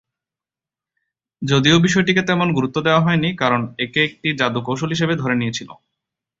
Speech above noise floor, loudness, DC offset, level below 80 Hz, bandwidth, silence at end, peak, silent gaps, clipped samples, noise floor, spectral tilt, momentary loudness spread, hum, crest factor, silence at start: 71 dB; -18 LUFS; under 0.1%; -52 dBFS; 7.8 kHz; 0.65 s; -2 dBFS; none; under 0.1%; -89 dBFS; -5 dB/octave; 8 LU; none; 18 dB; 1.4 s